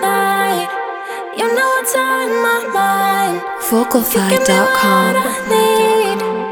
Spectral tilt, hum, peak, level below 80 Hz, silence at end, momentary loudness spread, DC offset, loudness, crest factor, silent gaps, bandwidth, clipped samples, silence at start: -3.5 dB/octave; none; 0 dBFS; -54 dBFS; 0 s; 8 LU; under 0.1%; -14 LUFS; 14 dB; none; over 20 kHz; under 0.1%; 0 s